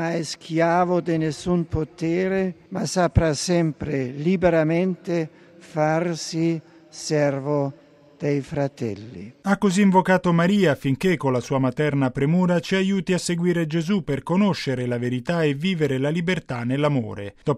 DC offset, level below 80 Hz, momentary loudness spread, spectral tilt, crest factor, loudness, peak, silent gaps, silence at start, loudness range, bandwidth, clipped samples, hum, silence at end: under 0.1%; -46 dBFS; 9 LU; -6 dB/octave; 18 dB; -22 LUFS; -4 dBFS; none; 0 s; 5 LU; 13 kHz; under 0.1%; none; 0 s